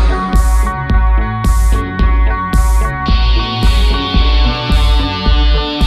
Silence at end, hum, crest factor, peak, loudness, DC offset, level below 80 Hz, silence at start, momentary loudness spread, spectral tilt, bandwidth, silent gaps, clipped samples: 0 s; none; 10 dB; 0 dBFS; -14 LUFS; under 0.1%; -12 dBFS; 0 s; 2 LU; -5.5 dB/octave; 12.5 kHz; none; under 0.1%